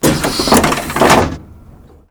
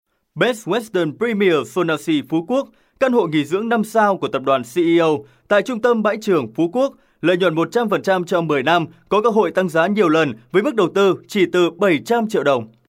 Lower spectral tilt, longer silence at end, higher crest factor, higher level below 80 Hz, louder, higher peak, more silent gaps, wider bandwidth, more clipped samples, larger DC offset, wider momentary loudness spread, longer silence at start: second, -4 dB/octave vs -6 dB/octave; first, 0.6 s vs 0.2 s; about the same, 14 dB vs 16 dB; first, -30 dBFS vs -64 dBFS; first, -12 LUFS vs -18 LUFS; about the same, 0 dBFS vs -2 dBFS; neither; first, over 20 kHz vs 16 kHz; neither; neither; first, 9 LU vs 5 LU; second, 0 s vs 0.35 s